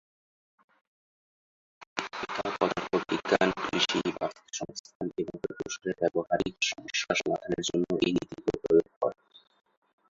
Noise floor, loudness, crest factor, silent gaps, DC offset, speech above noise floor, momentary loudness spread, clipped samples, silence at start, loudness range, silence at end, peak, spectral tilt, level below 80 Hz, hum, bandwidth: under -90 dBFS; -30 LUFS; 24 dB; 1.87-1.96 s, 4.80-4.84 s, 4.95-5.00 s, 8.96-9.01 s; under 0.1%; over 61 dB; 11 LU; under 0.1%; 1.8 s; 3 LU; 0.95 s; -8 dBFS; -4 dB/octave; -62 dBFS; none; 7.8 kHz